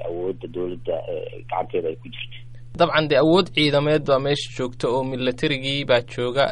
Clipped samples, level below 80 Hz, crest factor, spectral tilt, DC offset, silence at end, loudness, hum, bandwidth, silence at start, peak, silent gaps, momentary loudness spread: under 0.1%; -46 dBFS; 18 dB; -6 dB/octave; under 0.1%; 0 s; -22 LUFS; none; 11 kHz; 0 s; -4 dBFS; none; 14 LU